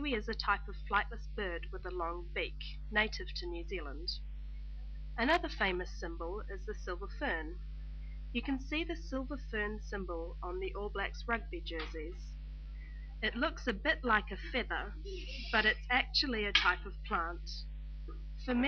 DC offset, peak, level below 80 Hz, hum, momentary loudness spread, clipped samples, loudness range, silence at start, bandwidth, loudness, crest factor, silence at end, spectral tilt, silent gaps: under 0.1%; -10 dBFS; -44 dBFS; 50 Hz at -45 dBFS; 17 LU; under 0.1%; 7 LU; 0 s; 6.6 kHz; -36 LUFS; 26 dB; 0 s; -2 dB/octave; none